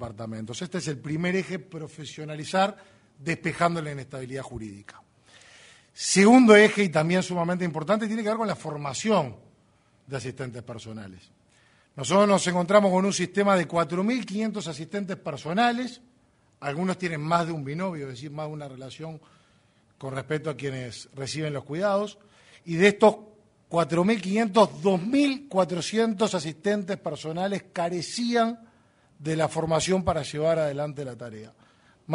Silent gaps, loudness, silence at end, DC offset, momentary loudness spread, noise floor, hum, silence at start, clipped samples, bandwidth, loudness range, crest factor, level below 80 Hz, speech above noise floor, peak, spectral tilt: none; -25 LUFS; 0 s; under 0.1%; 17 LU; -63 dBFS; none; 0 s; under 0.1%; 11 kHz; 11 LU; 24 dB; -60 dBFS; 38 dB; -2 dBFS; -5 dB/octave